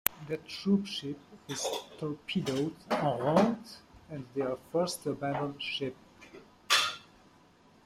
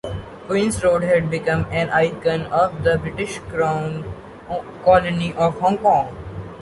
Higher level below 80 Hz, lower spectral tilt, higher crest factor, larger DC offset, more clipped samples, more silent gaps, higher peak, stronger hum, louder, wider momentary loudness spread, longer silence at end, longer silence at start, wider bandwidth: second, -68 dBFS vs -42 dBFS; second, -4 dB/octave vs -6 dB/octave; first, 32 dB vs 18 dB; neither; neither; neither; about the same, -2 dBFS vs -2 dBFS; neither; second, -32 LUFS vs -20 LUFS; first, 19 LU vs 14 LU; first, 0.85 s vs 0 s; about the same, 0.05 s vs 0.05 s; first, 16 kHz vs 11.5 kHz